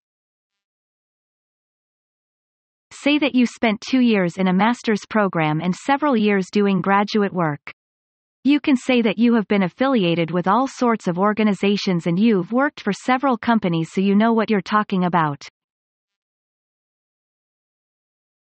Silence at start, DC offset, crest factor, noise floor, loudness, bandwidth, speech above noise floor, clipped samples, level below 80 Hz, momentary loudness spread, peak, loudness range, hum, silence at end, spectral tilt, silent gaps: 2.9 s; under 0.1%; 16 dB; under -90 dBFS; -19 LUFS; 8.8 kHz; over 72 dB; under 0.1%; -64 dBFS; 4 LU; -4 dBFS; 5 LU; none; 3.05 s; -6.5 dB/octave; 7.73-8.43 s